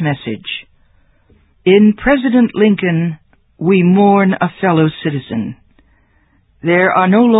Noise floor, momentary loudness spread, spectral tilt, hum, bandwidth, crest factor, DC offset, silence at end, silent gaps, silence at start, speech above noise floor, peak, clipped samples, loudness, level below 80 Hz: -54 dBFS; 13 LU; -11 dB/octave; none; 4 kHz; 14 dB; under 0.1%; 0 s; none; 0 s; 43 dB; 0 dBFS; under 0.1%; -13 LUFS; -46 dBFS